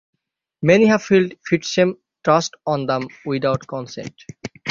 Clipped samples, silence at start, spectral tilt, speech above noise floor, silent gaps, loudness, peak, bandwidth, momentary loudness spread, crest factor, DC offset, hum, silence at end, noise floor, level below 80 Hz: under 0.1%; 0.6 s; -5.5 dB/octave; 34 dB; none; -19 LUFS; -2 dBFS; 7.6 kHz; 18 LU; 18 dB; under 0.1%; none; 0 s; -53 dBFS; -58 dBFS